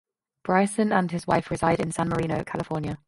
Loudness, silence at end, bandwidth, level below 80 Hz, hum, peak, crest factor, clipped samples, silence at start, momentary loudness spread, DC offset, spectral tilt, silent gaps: -25 LUFS; 0.1 s; 11.5 kHz; -50 dBFS; none; -4 dBFS; 20 dB; under 0.1%; 0.45 s; 7 LU; under 0.1%; -6 dB/octave; none